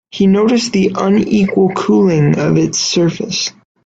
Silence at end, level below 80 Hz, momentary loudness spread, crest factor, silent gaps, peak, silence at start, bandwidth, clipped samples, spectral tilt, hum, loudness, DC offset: 0.35 s; -48 dBFS; 5 LU; 12 dB; none; 0 dBFS; 0.15 s; 8 kHz; under 0.1%; -5.5 dB/octave; none; -13 LUFS; under 0.1%